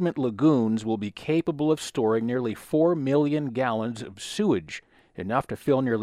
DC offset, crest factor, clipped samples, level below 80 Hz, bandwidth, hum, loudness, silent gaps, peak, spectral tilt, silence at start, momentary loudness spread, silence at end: under 0.1%; 16 dB; under 0.1%; -62 dBFS; 14 kHz; none; -25 LUFS; none; -10 dBFS; -6.5 dB/octave; 0 s; 10 LU; 0 s